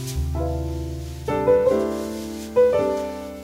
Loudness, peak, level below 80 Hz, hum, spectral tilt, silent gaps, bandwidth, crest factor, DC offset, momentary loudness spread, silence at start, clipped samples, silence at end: -23 LUFS; -6 dBFS; -34 dBFS; none; -6.5 dB/octave; none; 16 kHz; 16 dB; under 0.1%; 13 LU; 0 s; under 0.1%; 0 s